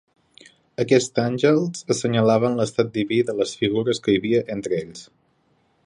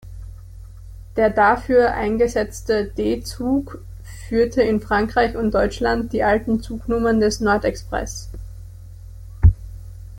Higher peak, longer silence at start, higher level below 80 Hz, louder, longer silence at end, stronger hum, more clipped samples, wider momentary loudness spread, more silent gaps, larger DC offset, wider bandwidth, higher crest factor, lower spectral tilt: about the same, -4 dBFS vs -2 dBFS; first, 0.8 s vs 0.05 s; second, -60 dBFS vs -32 dBFS; about the same, -21 LUFS vs -20 LUFS; first, 0.85 s vs 0 s; neither; neither; second, 9 LU vs 23 LU; neither; neither; second, 11.5 kHz vs 17 kHz; about the same, 18 dB vs 18 dB; about the same, -5.5 dB/octave vs -6 dB/octave